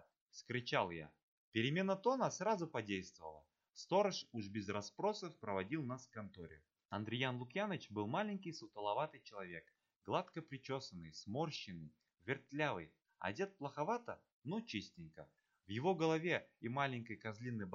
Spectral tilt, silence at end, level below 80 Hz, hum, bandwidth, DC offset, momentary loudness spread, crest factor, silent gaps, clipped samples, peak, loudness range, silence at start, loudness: -4 dB/octave; 0 s; -80 dBFS; none; 7.4 kHz; under 0.1%; 17 LU; 22 dB; 1.23-1.52 s, 6.85-6.89 s, 14.32-14.42 s; under 0.1%; -22 dBFS; 5 LU; 0.35 s; -42 LUFS